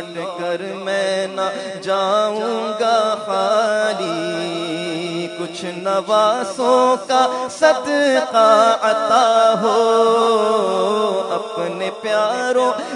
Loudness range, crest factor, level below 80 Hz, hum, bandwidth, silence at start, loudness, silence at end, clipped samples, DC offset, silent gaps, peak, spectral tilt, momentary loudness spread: 5 LU; 18 dB; -70 dBFS; none; 11 kHz; 0 s; -17 LUFS; 0 s; under 0.1%; under 0.1%; none; 0 dBFS; -3.5 dB/octave; 10 LU